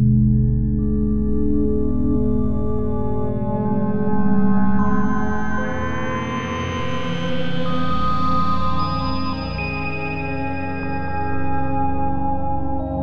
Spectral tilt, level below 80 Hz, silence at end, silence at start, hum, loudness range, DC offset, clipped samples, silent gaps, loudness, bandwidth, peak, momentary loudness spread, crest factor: -8 dB/octave; -30 dBFS; 0 s; 0 s; none; 3 LU; under 0.1%; under 0.1%; none; -22 LUFS; 6.6 kHz; -4 dBFS; 6 LU; 14 dB